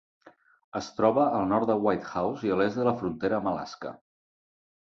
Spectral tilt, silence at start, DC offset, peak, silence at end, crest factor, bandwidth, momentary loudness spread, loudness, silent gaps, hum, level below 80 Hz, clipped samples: -7 dB/octave; 0.25 s; under 0.1%; -10 dBFS; 0.9 s; 20 dB; 7.6 kHz; 13 LU; -27 LUFS; 0.64-0.72 s; none; -62 dBFS; under 0.1%